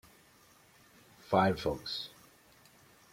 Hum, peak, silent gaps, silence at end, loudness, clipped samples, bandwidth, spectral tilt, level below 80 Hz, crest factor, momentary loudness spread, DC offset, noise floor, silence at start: none; -12 dBFS; none; 1.05 s; -32 LUFS; under 0.1%; 16.5 kHz; -6 dB/octave; -62 dBFS; 24 dB; 11 LU; under 0.1%; -63 dBFS; 1.3 s